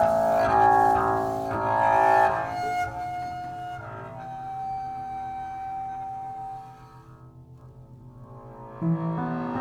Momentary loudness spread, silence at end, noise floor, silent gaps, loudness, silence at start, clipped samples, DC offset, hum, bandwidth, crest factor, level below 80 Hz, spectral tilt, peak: 19 LU; 0 s; -48 dBFS; none; -25 LUFS; 0 s; under 0.1%; under 0.1%; none; 18 kHz; 18 dB; -52 dBFS; -7 dB/octave; -8 dBFS